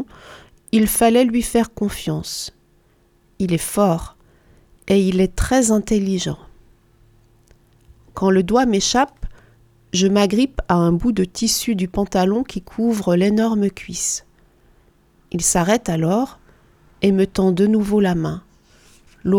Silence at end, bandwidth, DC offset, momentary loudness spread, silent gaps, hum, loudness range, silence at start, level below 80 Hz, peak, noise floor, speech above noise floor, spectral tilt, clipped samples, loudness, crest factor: 0 s; 18.5 kHz; under 0.1%; 11 LU; none; none; 3 LU; 0 s; -38 dBFS; 0 dBFS; -57 dBFS; 39 dB; -5 dB/octave; under 0.1%; -18 LUFS; 18 dB